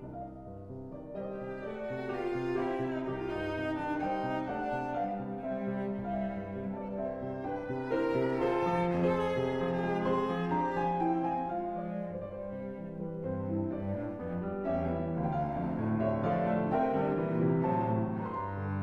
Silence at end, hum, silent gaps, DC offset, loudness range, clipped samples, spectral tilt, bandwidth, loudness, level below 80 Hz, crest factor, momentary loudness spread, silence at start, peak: 0 s; none; none; under 0.1%; 5 LU; under 0.1%; -9 dB/octave; 8 kHz; -33 LUFS; -56 dBFS; 16 dB; 10 LU; 0 s; -18 dBFS